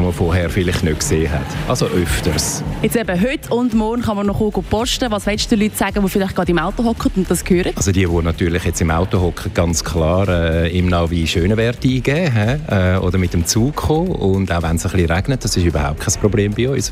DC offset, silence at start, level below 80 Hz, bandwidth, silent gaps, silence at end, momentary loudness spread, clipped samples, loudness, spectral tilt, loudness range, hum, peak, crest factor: under 0.1%; 0 s; -30 dBFS; 16 kHz; none; 0 s; 3 LU; under 0.1%; -17 LUFS; -5 dB/octave; 1 LU; none; -2 dBFS; 16 dB